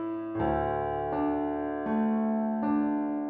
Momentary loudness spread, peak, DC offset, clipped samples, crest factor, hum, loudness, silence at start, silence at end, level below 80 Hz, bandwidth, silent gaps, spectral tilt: 4 LU; -16 dBFS; under 0.1%; under 0.1%; 12 dB; none; -29 LUFS; 0 s; 0 s; -50 dBFS; 4.1 kHz; none; -7.5 dB/octave